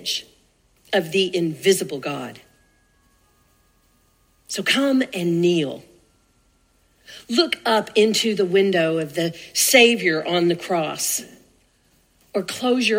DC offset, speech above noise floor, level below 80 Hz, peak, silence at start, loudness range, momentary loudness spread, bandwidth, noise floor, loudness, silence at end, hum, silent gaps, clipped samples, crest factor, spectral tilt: under 0.1%; 41 dB; -66 dBFS; 0 dBFS; 0 s; 8 LU; 12 LU; 16 kHz; -61 dBFS; -20 LUFS; 0 s; none; none; under 0.1%; 22 dB; -3.5 dB/octave